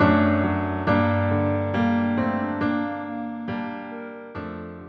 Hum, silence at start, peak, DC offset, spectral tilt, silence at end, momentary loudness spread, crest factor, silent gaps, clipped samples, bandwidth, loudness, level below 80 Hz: none; 0 s; -6 dBFS; under 0.1%; -9.5 dB/octave; 0 s; 14 LU; 18 dB; none; under 0.1%; 6 kHz; -24 LUFS; -52 dBFS